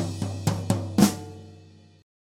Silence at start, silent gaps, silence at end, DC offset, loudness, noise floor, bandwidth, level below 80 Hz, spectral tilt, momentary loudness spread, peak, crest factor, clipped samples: 0 s; none; 0.75 s; under 0.1%; -25 LUFS; -51 dBFS; 17 kHz; -54 dBFS; -5.5 dB/octave; 19 LU; -4 dBFS; 22 dB; under 0.1%